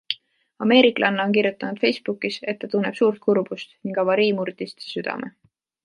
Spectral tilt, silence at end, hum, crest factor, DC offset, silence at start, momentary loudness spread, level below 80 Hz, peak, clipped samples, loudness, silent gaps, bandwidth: -6 dB/octave; 0.55 s; none; 22 dB; under 0.1%; 0.1 s; 13 LU; -72 dBFS; -2 dBFS; under 0.1%; -22 LUFS; none; 11 kHz